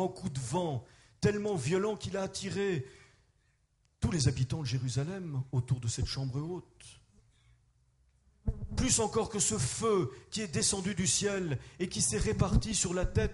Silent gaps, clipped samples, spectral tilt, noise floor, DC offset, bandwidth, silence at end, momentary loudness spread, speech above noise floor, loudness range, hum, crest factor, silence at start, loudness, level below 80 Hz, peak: none; under 0.1%; -4.5 dB/octave; -73 dBFS; under 0.1%; 11.5 kHz; 0 s; 9 LU; 40 dB; 7 LU; none; 20 dB; 0 s; -32 LUFS; -44 dBFS; -14 dBFS